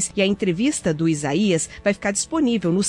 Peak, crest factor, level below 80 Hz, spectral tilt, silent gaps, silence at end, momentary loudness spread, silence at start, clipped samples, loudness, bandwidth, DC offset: -6 dBFS; 14 dB; -50 dBFS; -4.5 dB/octave; none; 0 s; 2 LU; 0 s; under 0.1%; -21 LUFS; 11.5 kHz; under 0.1%